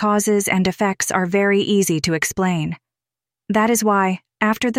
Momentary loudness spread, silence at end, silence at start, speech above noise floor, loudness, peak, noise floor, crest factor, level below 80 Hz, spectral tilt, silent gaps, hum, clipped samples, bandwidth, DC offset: 6 LU; 0 s; 0 s; 71 dB; -18 LUFS; -4 dBFS; -89 dBFS; 16 dB; -52 dBFS; -4.5 dB/octave; none; none; under 0.1%; 16 kHz; under 0.1%